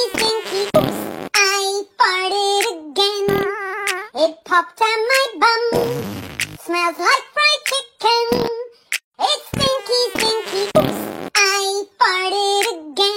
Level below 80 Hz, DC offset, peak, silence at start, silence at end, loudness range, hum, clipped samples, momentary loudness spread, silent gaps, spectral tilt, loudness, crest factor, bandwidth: -50 dBFS; under 0.1%; 0 dBFS; 0 s; 0 s; 1 LU; none; under 0.1%; 8 LU; 9.04-9.12 s; -2.5 dB/octave; -18 LUFS; 18 dB; 16.5 kHz